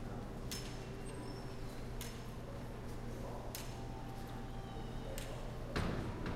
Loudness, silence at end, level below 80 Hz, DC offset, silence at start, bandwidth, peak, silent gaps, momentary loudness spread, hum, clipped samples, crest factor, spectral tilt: -46 LUFS; 0 s; -48 dBFS; under 0.1%; 0 s; 16 kHz; -24 dBFS; none; 6 LU; none; under 0.1%; 20 dB; -5.5 dB/octave